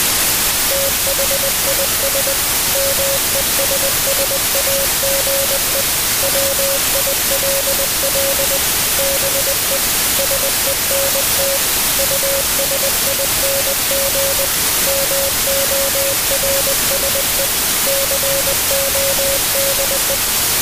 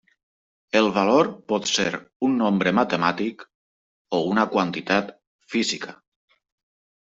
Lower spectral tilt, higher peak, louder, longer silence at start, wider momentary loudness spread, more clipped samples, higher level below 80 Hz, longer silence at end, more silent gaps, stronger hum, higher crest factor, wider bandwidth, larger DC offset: second, -0.5 dB/octave vs -4.5 dB/octave; about the same, -4 dBFS vs -4 dBFS; first, -13 LUFS vs -22 LUFS; second, 0 s vs 0.75 s; second, 1 LU vs 9 LU; neither; first, -36 dBFS vs -64 dBFS; second, 0 s vs 1.1 s; second, none vs 2.16-2.20 s, 3.55-4.05 s, 5.27-5.39 s; neither; second, 12 dB vs 20 dB; first, 16 kHz vs 8 kHz; neither